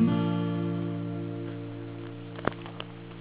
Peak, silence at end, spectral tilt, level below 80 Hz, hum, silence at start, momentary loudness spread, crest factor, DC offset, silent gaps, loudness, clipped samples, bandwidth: -6 dBFS; 0 s; -7 dB/octave; -62 dBFS; none; 0 s; 12 LU; 24 dB; 0.1%; none; -33 LUFS; under 0.1%; 4 kHz